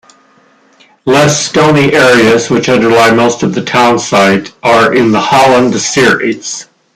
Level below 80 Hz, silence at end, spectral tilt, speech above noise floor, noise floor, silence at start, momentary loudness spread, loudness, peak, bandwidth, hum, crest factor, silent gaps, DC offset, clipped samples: -46 dBFS; 0.3 s; -4 dB/octave; 39 dB; -46 dBFS; 1.05 s; 7 LU; -8 LUFS; 0 dBFS; 16 kHz; none; 8 dB; none; under 0.1%; under 0.1%